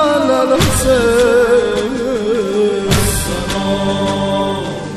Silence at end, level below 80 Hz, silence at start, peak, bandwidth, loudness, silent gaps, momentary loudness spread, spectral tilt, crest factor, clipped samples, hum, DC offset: 0 s; -30 dBFS; 0 s; 0 dBFS; 14.5 kHz; -14 LUFS; none; 7 LU; -4.5 dB/octave; 12 dB; under 0.1%; none; under 0.1%